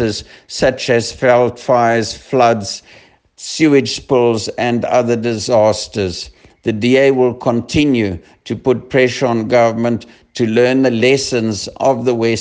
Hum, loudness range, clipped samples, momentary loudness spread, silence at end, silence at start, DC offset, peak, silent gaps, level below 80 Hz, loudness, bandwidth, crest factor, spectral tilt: none; 1 LU; under 0.1%; 11 LU; 0 s; 0 s; under 0.1%; 0 dBFS; none; -46 dBFS; -14 LUFS; 9.8 kHz; 14 dB; -5 dB/octave